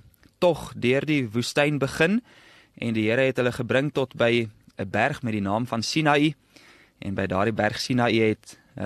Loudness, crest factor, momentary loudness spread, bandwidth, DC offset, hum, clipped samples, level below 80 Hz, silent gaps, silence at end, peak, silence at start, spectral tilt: -24 LUFS; 18 dB; 9 LU; 13 kHz; under 0.1%; none; under 0.1%; -56 dBFS; none; 0 s; -6 dBFS; 0.4 s; -5.5 dB/octave